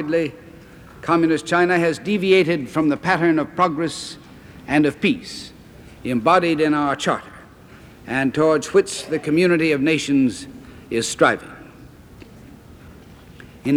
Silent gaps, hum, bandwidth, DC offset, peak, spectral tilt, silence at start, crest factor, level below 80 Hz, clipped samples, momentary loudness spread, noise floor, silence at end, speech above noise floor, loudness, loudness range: none; none; 14.5 kHz; under 0.1%; -2 dBFS; -5 dB/octave; 0 s; 18 dB; -52 dBFS; under 0.1%; 15 LU; -44 dBFS; 0 s; 25 dB; -19 LUFS; 3 LU